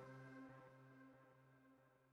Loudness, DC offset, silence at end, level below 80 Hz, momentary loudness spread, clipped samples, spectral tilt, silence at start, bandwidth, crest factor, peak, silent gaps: -63 LUFS; under 0.1%; 0 s; under -90 dBFS; 8 LU; under 0.1%; -7.5 dB/octave; 0 s; 10 kHz; 14 dB; -50 dBFS; none